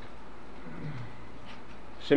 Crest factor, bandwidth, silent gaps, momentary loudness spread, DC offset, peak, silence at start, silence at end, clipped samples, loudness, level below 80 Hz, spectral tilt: 26 dB; 11 kHz; none; 8 LU; 2%; -10 dBFS; 0 s; 0 s; under 0.1%; -45 LUFS; -56 dBFS; -7 dB/octave